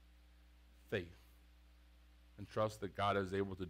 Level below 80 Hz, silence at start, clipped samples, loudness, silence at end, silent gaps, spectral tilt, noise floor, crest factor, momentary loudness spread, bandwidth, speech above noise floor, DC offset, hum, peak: -64 dBFS; 0.85 s; under 0.1%; -41 LUFS; 0 s; none; -6 dB/octave; -64 dBFS; 20 dB; 19 LU; 16 kHz; 24 dB; under 0.1%; none; -24 dBFS